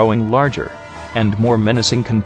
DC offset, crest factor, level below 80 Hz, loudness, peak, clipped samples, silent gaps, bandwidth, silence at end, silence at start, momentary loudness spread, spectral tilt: under 0.1%; 16 dB; -44 dBFS; -16 LUFS; 0 dBFS; under 0.1%; none; 9.2 kHz; 0 s; 0 s; 12 LU; -5.5 dB/octave